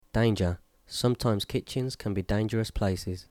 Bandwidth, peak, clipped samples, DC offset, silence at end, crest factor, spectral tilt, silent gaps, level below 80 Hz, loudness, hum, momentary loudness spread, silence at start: 16.5 kHz; -14 dBFS; under 0.1%; under 0.1%; 0.1 s; 14 dB; -6 dB/octave; none; -44 dBFS; -29 LUFS; none; 7 LU; 0.15 s